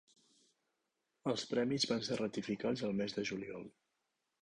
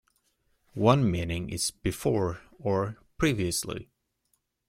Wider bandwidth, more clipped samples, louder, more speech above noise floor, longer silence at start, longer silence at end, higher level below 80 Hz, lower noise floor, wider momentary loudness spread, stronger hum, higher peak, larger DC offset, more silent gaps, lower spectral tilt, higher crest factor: second, 10.5 kHz vs 16.5 kHz; neither; second, -38 LUFS vs -28 LUFS; about the same, 48 dB vs 48 dB; first, 1.25 s vs 0.75 s; second, 0.7 s vs 0.85 s; second, -74 dBFS vs -50 dBFS; first, -86 dBFS vs -75 dBFS; about the same, 11 LU vs 12 LU; neither; second, -22 dBFS vs -6 dBFS; neither; neither; about the same, -4.5 dB/octave vs -5 dB/octave; about the same, 20 dB vs 22 dB